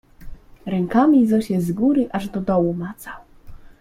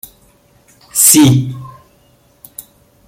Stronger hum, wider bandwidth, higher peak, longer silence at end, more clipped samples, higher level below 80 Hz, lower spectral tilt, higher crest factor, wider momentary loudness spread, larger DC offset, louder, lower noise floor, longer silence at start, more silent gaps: neither; second, 16 kHz vs over 20 kHz; second, -4 dBFS vs 0 dBFS; second, 0.1 s vs 1.4 s; second, under 0.1% vs 0.1%; about the same, -46 dBFS vs -46 dBFS; first, -8 dB/octave vs -4 dB/octave; about the same, 16 dB vs 16 dB; second, 21 LU vs 27 LU; neither; second, -19 LUFS vs -9 LUFS; second, -39 dBFS vs -51 dBFS; second, 0.2 s vs 0.95 s; neither